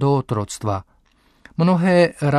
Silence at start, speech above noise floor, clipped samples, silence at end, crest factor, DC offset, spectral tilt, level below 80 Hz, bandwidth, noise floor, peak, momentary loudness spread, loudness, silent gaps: 0 s; 40 dB; under 0.1%; 0 s; 16 dB; under 0.1%; -7 dB/octave; -52 dBFS; 13 kHz; -58 dBFS; -4 dBFS; 12 LU; -19 LUFS; none